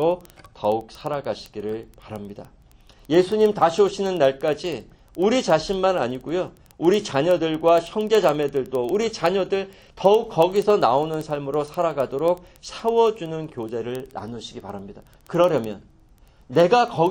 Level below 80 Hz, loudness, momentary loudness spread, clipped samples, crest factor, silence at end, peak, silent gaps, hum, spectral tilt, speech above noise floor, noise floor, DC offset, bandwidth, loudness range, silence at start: -54 dBFS; -22 LUFS; 16 LU; under 0.1%; 20 dB; 0 s; -2 dBFS; none; none; -5.5 dB/octave; 31 dB; -53 dBFS; under 0.1%; 17 kHz; 5 LU; 0 s